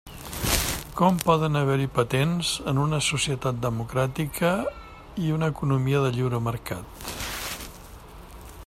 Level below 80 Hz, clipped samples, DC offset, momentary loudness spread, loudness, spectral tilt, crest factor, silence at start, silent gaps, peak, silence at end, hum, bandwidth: -44 dBFS; under 0.1%; under 0.1%; 15 LU; -25 LUFS; -5 dB/octave; 24 dB; 0.05 s; none; -2 dBFS; 0 s; none; 16 kHz